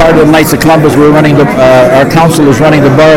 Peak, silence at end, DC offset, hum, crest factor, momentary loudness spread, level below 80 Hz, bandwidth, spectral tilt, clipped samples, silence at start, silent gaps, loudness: 0 dBFS; 0 s; 1%; none; 4 dB; 2 LU; -28 dBFS; 17 kHz; -6 dB/octave; 9%; 0 s; none; -4 LUFS